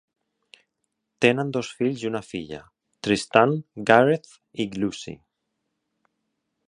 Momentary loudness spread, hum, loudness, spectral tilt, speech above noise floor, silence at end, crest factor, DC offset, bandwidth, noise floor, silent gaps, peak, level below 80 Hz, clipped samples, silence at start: 19 LU; none; -23 LUFS; -5.5 dB/octave; 56 dB; 1.5 s; 24 dB; under 0.1%; 11 kHz; -79 dBFS; none; 0 dBFS; -62 dBFS; under 0.1%; 1.2 s